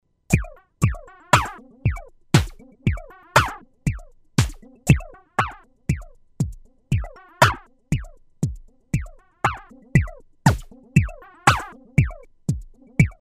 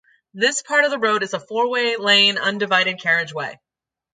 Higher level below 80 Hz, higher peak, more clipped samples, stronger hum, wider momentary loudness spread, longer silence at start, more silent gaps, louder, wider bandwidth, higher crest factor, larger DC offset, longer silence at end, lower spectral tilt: first, -34 dBFS vs -74 dBFS; about the same, 0 dBFS vs -2 dBFS; neither; neither; first, 14 LU vs 10 LU; about the same, 0.3 s vs 0.35 s; neither; second, -23 LUFS vs -18 LUFS; first, 15.5 kHz vs 9.6 kHz; first, 24 dB vs 18 dB; neither; second, 0.1 s vs 0.6 s; first, -5.5 dB/octave vs -2 dB/octave